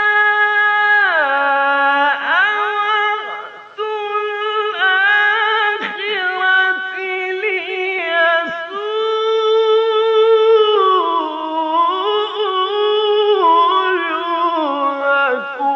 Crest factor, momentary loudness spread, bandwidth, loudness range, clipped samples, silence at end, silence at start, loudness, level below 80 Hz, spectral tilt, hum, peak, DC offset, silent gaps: 12 dB; 8 LU; 6.6 kHz; 3 LU; under 0.1%; 0 s; 0 s; -15 LUFS; -78 dBFS; -2.5 dB/octave; none; -2 dBFS; under 0.1%; none